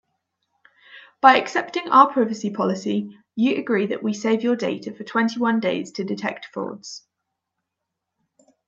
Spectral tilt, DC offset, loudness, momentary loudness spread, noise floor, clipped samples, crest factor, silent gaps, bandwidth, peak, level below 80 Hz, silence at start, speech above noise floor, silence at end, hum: -5 dB/octave; under 0.1%; -21 LUFS; 16 LU; -82 dBFS; under 0.1%; 22 dB; none; 7.8 kHz; 0 dBFS; -74 dBFS; 0.9 s; 61 dB; 1.7 s; none